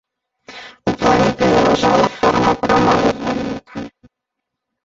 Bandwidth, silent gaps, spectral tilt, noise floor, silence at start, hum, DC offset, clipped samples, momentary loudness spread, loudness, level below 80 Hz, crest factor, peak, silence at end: 8 kHz; none; -5.5 dB/octave; -79 dBFS; 0.5 s; none; under 0.1%; under 0.1%; 18 LU; -15 LUFS; -42 dBFS; 16 dB; -2 dBFS; 0.95 s